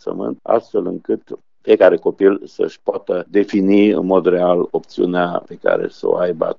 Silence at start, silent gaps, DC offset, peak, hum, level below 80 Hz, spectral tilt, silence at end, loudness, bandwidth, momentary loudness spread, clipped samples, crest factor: 0.05 s; none; 0.3%; 0 dBFS; none; -66 dBFS; -5.5 dB/octave; 0.05 s; -17 LUFS; 7 kHz; 11 LU; under 0.1%; 16 dB